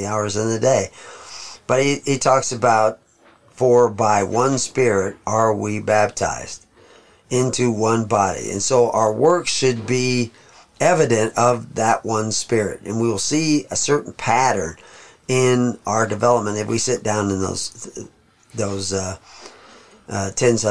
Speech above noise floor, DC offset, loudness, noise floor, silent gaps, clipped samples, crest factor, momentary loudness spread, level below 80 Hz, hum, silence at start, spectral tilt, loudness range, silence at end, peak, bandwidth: 34 dB; 0.6%; -19 LUFS; -53 dBFS; none; under 0.1%; 18 dB; 13 LU; -54 dBFS; none; 0 s; -4.5 dB/octave; 4 LU; 0 s; -2 dBFS; 11 kHz